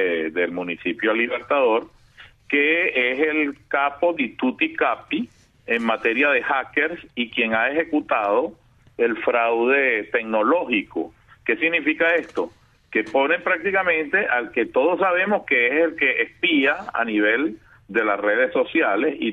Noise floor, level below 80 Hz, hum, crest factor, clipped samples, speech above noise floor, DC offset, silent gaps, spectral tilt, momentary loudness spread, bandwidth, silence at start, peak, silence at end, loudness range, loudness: -49 dBFS; -62 dBFS; none; 16 dB; under 0.1%; 28 dB; under 0.1%; none; -6 dB/octave; 7 LU; 6.8 kHz; 0 s; -6 dBFS; 0 s; 2 LU; -21 LUFS